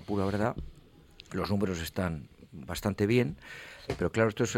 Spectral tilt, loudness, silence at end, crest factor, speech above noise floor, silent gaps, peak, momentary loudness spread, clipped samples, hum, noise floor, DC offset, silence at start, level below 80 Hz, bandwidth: -6 dB/octave; -31 LUFS; 0 s; 18 dB; 24 dB; none; -12 dBFS; 17 LU; under 0.1%; none; -55 dBFS; under 0.1%; 0 s; -50 dBFS; 16.5 kHz